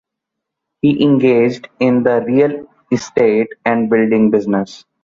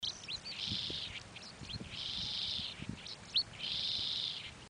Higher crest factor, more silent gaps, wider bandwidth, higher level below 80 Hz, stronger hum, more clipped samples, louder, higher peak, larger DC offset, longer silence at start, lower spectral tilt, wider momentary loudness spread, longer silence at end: second, 12 dB vs 18 dB; neither; second, 7.6 kHz vs 13 kHz; first, -56 dBFS vs -62 dBFS; neither; neither; first, -14 LUFS vs -38 LUFS; first, -2 dBFS vs -22 dBFS; neither; first, 0.85 s vs 0 s; first, -7 dB/octave vs -2.5 dB/octave; second, 8 LU vs 11 LU; first, 0.25 s vs 0 s